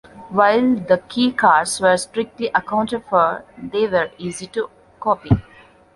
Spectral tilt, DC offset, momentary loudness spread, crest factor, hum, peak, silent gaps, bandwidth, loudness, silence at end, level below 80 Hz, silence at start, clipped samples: -5 dB/octave; under 0.1%; 12 LU; 18 dB; none; -2 dBFS; none; 11.5 kHz; -19 LUFS; 0.55 s; -42 dBFS; 0.15 s; under 0.1%